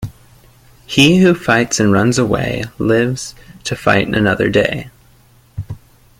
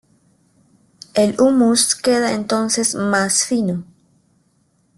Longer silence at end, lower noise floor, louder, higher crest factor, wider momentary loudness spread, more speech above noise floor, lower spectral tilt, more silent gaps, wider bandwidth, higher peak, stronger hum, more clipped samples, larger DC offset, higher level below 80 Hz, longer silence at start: second, 0.4 s vs 1.15 s; second, -48 dBFS vs -61 dBFS; first, -14 LUFS vs -17 LUFS; about the same, 16 dB vs 16 dB; first, 19 LU vs 7 LU; second, 35 dB vs 45 dB; first, -5 dB/octave vs -3 dB/octave; neither; first, 16 kHz vs 12.5 kHz; first, 0 dBFS vs -4 dBFS; neither; neither; neither; first, -40 dBFS vs -58 dBFS; second, 0 s vs 1.15 s